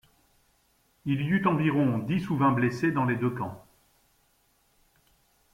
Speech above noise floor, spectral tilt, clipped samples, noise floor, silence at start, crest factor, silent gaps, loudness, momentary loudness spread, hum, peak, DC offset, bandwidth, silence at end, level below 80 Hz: 42 dB; -8 dB/octave; under 0.1%; -68 dBFS; 1.05 s; 20 dB; none; -27 LUFS; 12 LU; none; -10 dBFS; under 0.1%; 16 kHz; 1.95 s; -62 dBFS